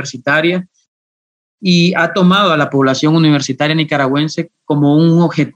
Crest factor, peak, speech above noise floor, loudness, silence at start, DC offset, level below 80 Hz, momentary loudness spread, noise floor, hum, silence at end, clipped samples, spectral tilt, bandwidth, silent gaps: 12 dB; -2 dBFS; over 78 dB; -12 LUFS; 0 s; under 0.1%; -60 dBFS; 8 LU; under -90 dBFS; none; 0.05 s; under 0.1%; -6 dB/octave; 8.2 kHz; 0.88-1.58 s